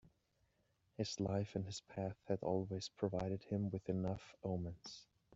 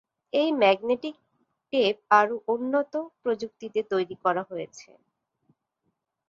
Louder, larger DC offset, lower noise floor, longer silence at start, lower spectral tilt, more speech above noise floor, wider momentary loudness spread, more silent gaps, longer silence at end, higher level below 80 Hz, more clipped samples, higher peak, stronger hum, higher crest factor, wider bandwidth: second, -43 LUFS vs -26 LUFS; neither; about the same, -80 dBFS vs -78 dBFS; second, 0.05 s vs 0.35 s; first, -7 dB/octave vs -5 dB/octave; second, 38 dB vs 53 dB; second, 8 LU vs 11 LU; neither; second, 0 s vs 1.45 s; first, -68 dBFS vs -74 dBFS; neither; second, -24 dBFS vs -6 dBFS; neither; about the same, 20 dB vs 22 dB; about the same, 8 kHz vs 7.6 kHz